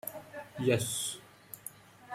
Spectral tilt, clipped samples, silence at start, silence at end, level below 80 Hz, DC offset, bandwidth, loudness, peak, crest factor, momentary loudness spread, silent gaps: -4 dB/octave; under 0.1%; 0.05 s; 0 s; -68 dBFS; under 0.1%; 16.5 kHz; -33 LUFS; -16 dBFS; 20 dB; 17 LU; none